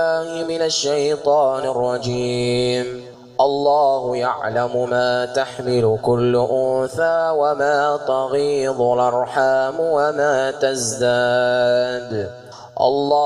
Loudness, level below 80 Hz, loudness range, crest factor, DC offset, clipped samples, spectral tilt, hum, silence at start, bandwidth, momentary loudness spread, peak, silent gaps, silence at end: -19 LUFS; -54 dBFS; 1 LU; 14 dB; under 0.1%; under 0.1%; -4.5 dB/octave; none; 0 s; 12.5 kHz; 6 LU; -4 dBFS; none; 0 s